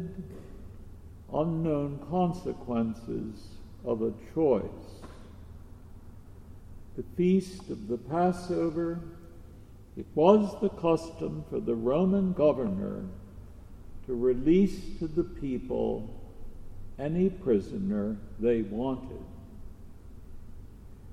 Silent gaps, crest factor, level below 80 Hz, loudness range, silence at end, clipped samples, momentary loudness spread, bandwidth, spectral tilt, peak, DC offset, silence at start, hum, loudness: none; 22 dB; -46 dBFS; 6 LU; 0 s; under 0.1%; 25 LU; 11.5 kHz; -8.5 dB/octave; -8 dBFS; under 0.1%; 0 s; none; -29 LUFS